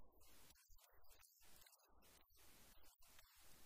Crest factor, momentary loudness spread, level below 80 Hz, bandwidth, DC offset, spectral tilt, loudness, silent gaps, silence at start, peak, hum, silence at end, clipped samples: 14 dB; 2 LU; -76 dBFS; 16 kHz; under 0.1%; -1.5 dB/octave; -69 LUFS; none; 0 s; -52 dBFS; none; 0 s; under 0.1%